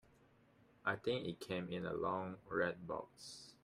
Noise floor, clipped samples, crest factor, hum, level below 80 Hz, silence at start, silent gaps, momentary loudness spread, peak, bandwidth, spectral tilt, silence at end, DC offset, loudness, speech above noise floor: -70 dBFS; under 0.1%; 20 dB; none; -74 dBFS; 0.85 s; none; 9 LU; -22 dBFS; 15 kHz; -5.5 dB/octave; 0.1 s; under 0.1%; -42 LUFS; 27 dB